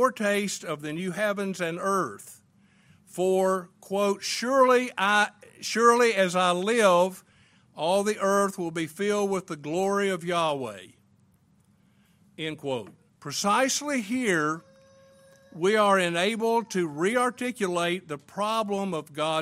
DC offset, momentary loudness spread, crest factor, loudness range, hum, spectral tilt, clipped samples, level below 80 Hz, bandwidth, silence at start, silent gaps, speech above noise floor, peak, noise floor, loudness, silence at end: under 0.1%; 12 LU; 20 dB; 7 LU; none; -4 dB/octave; under 0.1%; -72 dBFS; 16 kHz; 0 s; none; 37 dB; -8 dBFS; -63 dBFS; -26 LUFS; 0 s